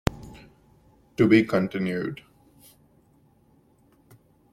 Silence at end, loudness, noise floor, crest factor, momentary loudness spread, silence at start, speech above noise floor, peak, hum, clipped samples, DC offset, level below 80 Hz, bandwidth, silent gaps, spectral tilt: 2.4 s; -23 LUFS; -61 dBFS; 24 dB; 25 LU; 0.1 s; 39 dB; -4 dBFS; none; under 0.1%; under 0.1%; -48 dBFS; 15.5 kHz; none; -7 dB/octave